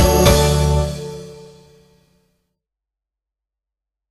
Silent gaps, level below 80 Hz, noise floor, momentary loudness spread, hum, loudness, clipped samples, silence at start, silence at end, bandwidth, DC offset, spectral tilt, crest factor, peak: none; -26 dBFS; -85 dBFS; 22 LU; none; -15 LUFS; under 0.1%; 0 s; 2.7 s; 15.5 kHz; under 0.1%; -5 dB/octave; 20 dB; 0 dBFS